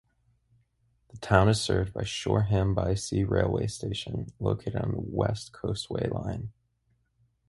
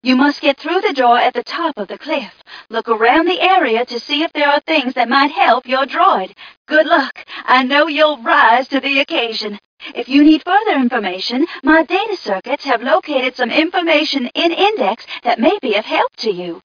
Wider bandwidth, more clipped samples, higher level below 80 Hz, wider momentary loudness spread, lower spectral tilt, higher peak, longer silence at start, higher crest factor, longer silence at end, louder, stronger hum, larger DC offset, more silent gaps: first, 11.5 kHz vs 5.4 kHz; neither; first, -44 dBFS vs -58 dBFS; about the same, 10 LU vs 10 LU; first, -6 dB/octave vs -4 dB/octave; second, -4 dBFS vs 0 dBFS; first, 1.15 s vs 0.05 s; first, 26 dB vs 14 dB; first, 1 s vs 0.05 s; second, -29 LUFS vs -14 LUFS; neither; neither; second, none vs 6.57-6.65 s, 9.65-9.77 s